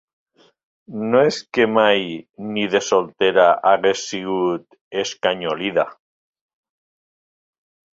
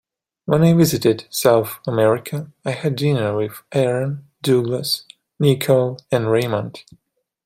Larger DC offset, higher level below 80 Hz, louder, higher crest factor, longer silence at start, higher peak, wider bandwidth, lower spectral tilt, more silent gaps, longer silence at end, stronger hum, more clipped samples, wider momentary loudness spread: neither; second, -64 dBFS vs -56 dBFS; about the same, -19 LUFS vs -19 LUFS; about the same, 20 dB vs 18 dB; first, 0.9 s vs 0.45 s; about the same, 0 dBFS vs -2 dBFS; second, 7.8 kHz vs 16 kHz; second, -4 dB/octave vs -6 dB/octave; first, 2.30-2.34 s, 4.81-4.91 s vs none; first, 2 s vs 0.65 s; neither; neither; first, 13 LU vs 10 LU